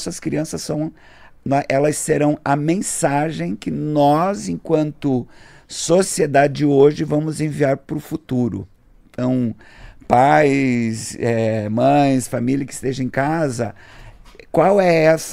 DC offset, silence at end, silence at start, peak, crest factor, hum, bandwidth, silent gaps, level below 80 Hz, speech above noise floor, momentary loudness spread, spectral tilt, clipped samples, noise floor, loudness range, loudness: under 0.1%; 0 s; 0 s; 0 dBFS; 18 dB; none; 15.5 kHz; none; -48 dBFS; 24 dB; 11 LU; -5.5 dB/octave; under 0.1%; -41 dBFS; 3 LU; -18 LUFS